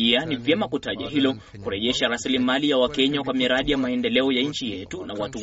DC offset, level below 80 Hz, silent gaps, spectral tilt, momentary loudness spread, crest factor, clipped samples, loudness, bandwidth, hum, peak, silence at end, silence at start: under 0.1%; -50 dBFS; none; -2.5 dB/octave; 10 LU; 18 dB; under 0.1%; -23 LUFS; 8 kHz; none; -6 dBFS; 0 s; 0 s